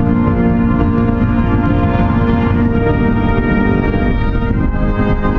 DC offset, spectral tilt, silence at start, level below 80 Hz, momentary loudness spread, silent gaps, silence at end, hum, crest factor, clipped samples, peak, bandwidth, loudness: under 0.1%; -10.5 dB/octave; 0 s; -18 dBFS; 3 LU; none; 0 s; none; 12 dB; under 0.1%; 0 dBFS; 4.9 kHz; -14 LUFS